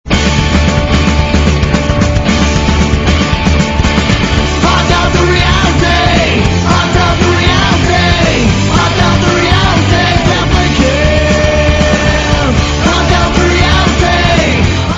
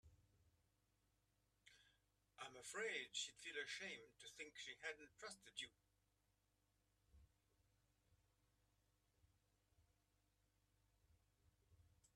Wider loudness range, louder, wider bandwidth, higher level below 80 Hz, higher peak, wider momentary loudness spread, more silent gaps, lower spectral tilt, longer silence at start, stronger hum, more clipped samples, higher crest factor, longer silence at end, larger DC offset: second, 1 LU vs 10 LU; first, -9 LUFS vs -52 LUFS; second, 8 kHz vs 13 kHz; first, -16 dBFS vs -84 dBFS; first, 0 dBFS vs -34 dBFS; second, 2 LU vs 11 LU; neither; first, -5 dB/octave vs -0.5 dB/octave; about the same, 0.05 s vs 0.05 s; neither; first, 0.3% vs under 0.1%; second, 8 dB vs 24 dB; about the same, 0 s vs 0.1 s; neither